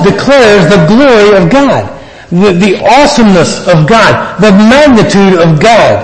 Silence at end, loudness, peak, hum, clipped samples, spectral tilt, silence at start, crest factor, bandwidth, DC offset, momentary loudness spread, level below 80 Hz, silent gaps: 0 s; -4 LUFS; 0 dBFS; none; 6%; -5.5 dB/octave; 0 s; 4 dB; 11 kHz; under 0.1%; 4 LU; -30 dBFS; none